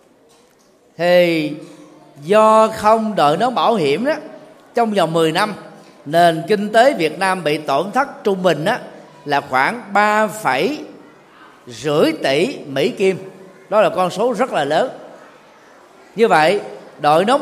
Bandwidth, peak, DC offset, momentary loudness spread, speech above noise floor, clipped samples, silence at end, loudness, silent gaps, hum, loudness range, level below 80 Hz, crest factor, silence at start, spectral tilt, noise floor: 15 kHz; 0 dBFS; under 0.1%; 15 LU; 37 dB; under 0.1%; 0 s; -16 LUFS; none; none; 4 LU; -64 dBFS; 16 dB; 1 s; -5 dB/octave; -52 dBFS